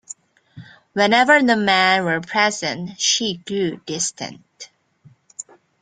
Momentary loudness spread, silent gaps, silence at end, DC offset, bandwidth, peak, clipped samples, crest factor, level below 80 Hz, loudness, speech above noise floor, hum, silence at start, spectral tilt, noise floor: 23 LU; none; 0.4 s; under 0.1%; 9.6 kHz; -2 dBFS; under 0.1%; 20 dB; -64 dBFS; -18 LUFS; 34 dB; none; 0.1 s; -2.5 dB/octave; -53 dBFS